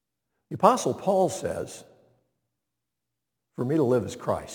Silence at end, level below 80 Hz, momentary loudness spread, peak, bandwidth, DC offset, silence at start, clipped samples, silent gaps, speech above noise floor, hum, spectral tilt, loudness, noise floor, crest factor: 0 s; -62 dBFS; 18 LU; -4 dBFS; 19 kHz; under 0.1%; 0.5 s; under 0.1%; none; 60 dB; 60 Hz at -60 dBFS; -6 dB/octave; -25 LUFS; -85 dBFS; 24 dB